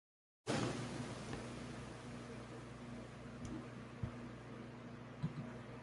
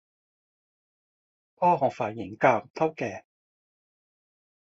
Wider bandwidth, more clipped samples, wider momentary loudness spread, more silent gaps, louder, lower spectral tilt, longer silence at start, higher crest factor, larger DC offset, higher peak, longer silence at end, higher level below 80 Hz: first, 11.5 kHz vs 7.8 kHz; neither; about the same, 10 LU vs 11 LU; second, none vs 2.70-2.74 s; second, -48 LUFS vs -26 LUFS; second, -5.5 dB/octave vs -7 dB/octave; second, 0.45 s vs 1.6 s; about the same, 20 dB vs 24 dB; neither; second, -28 dBFS vs -6 dBFS; second, 0 s vs 1.55 s; first, -64 dBFS vs -70 dBFS